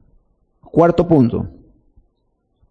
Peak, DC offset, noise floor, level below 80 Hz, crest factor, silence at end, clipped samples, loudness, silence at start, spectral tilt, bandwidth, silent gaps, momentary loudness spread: -2 dBFS; under 0.1%; -66 dBFS; -44 dBFS; 18 dB; 1.2 s; under 0.1%; -15 LUFS; 0.75 s; -10 dB/octave; 7.4 kHz; none; 12 LU